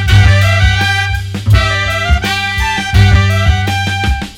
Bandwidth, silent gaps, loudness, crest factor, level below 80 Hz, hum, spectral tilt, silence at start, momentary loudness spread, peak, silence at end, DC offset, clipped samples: 15 kHz; none; -11 LUFS; 10 dB; -18 dBFS; none; -5 dB/octave; 0 s; 6 LU; 0 dBFS; 0 s; under 0.1%; 0.5%